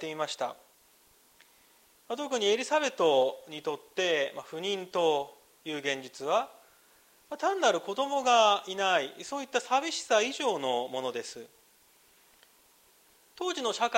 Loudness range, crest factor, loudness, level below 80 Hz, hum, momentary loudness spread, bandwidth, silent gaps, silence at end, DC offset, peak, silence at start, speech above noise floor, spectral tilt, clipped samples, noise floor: 6 LU; 22 dB; -29 LUFS; -80 dBFS; none; 13 LU; 16 kHz; none; 0 s; under 0.1%; -10 dBFS; 0 s; 33 dB; -2 dB/octave; under 0.1%; -63 dBFS